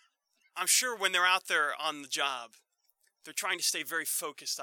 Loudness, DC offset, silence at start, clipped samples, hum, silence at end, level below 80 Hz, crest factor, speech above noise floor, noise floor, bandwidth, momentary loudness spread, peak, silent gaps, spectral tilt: -29 LUFS; under 0.1%; 0.55 s; under 0.1%; none; 0 s; under -90 dBFS; 22 dB; 42 dB; -74 dBFS; 19 kHz; 10 LU; -10 dBFS; none; 1.5 dB/octave